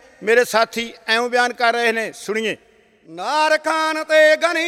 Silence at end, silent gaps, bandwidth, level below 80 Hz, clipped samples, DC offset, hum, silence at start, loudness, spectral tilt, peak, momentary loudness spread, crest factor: 0 s; none; 15.5 kHz; -68 dBFS; under 0.1%; under 0.1%; none; 0.2 s; -18 LUFS; -2 dB/octave; -2 dBFS; 10 LU; 16 dB